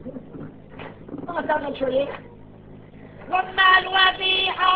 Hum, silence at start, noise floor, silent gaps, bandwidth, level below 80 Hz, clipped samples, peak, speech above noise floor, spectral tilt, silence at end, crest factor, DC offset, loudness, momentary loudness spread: none; 0 s; -44 dBFS; none; 6 kHz; -52 dBFS; under 0.1%; -4 dBFS; 24 dB; -5.5 dB/octave; 0 s; 20 dB; under 0.1%; -20 LUFS; 24 LU